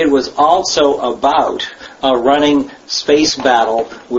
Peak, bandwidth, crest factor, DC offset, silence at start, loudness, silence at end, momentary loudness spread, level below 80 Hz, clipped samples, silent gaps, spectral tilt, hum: 0 dBFS; 8 kHz; 14 dB; under 0.1%; 0 s; -13 LUFS; 0 s; 8 LU; -46 dBFS; under 0.1%; none; -3 dB/octave; none